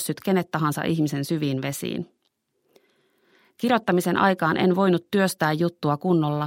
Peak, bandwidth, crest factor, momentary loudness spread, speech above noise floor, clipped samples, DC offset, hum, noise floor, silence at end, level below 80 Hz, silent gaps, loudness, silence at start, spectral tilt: -4 dBFS; 16.5 kHz; 20 dB; 8 LU; 51 dB; under 0.1%; under 0.1%; none; -73 dBFS; 0 s; -66 dBFS; none; -23 LUFS; 0 s; -6 dB/octave